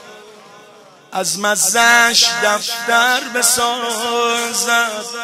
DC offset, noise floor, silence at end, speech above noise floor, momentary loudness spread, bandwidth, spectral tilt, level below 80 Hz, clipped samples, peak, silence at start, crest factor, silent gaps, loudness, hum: under 0.1%; -43 dBFS; 0 s; 28 dB; 9 LU; 16 kHz; 0 dB/octave; -62 dBFS; under 0.1%; 0 dBFS; 0 s; 16 dB; none; -14 LUFS; none